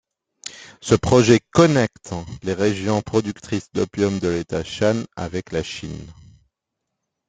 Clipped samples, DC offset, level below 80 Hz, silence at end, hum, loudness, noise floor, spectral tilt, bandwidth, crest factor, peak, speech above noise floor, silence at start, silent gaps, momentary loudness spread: under 0.1%; under 0.1%; -48 dBFS; 1.15 s; none; -20 LUFS; -80 dBFS; -5.5 dB/octave; 9.4 kHz; 20 dB; -2 dBFS; 60 dB; 0.45 s; none; 19 LU